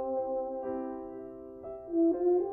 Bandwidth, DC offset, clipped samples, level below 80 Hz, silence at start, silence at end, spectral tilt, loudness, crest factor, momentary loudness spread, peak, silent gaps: 2.1 kHz; under 0.1%; under 0.1%; -64 dBFS; 0 s; 0 s; -11.5 dB/octave; -32 LUFS; 14 dB; 17 LU; -18 dBFS; none